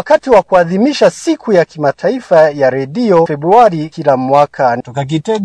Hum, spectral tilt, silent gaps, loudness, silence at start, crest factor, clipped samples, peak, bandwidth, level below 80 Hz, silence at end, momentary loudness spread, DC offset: none; -6 dB/octave; none; -11 LUFS; 0 s; 10 dB; 0.6%; 0 dBFS; 11 kHz; -48 dBFS; 0 s; 8 LU; under 0.1%